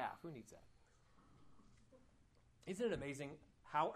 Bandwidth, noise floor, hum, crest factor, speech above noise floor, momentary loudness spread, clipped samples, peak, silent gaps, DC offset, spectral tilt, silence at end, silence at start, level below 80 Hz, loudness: 13 kHz; -72 dBFS; none; 22 dB; 27 dB; 20 LU; under 0.1%; -26 dBFS; none; under 0.1%; -5.5 dB/octave; 0 s; 0 s; -72 dBFS; -46 LUFS